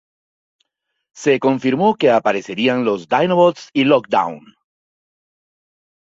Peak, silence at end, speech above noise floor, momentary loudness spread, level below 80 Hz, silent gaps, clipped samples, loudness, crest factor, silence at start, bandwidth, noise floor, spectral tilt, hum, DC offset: -2 dBFS; 1.65 s; 58 dB; 6 LU; -62 dBFS; none; under 0.1%; -16 LUFS; 16 dB; 1.15 s; 7.8 kHz; -74 dBFS; -6 dB/octave; none; under 0.1%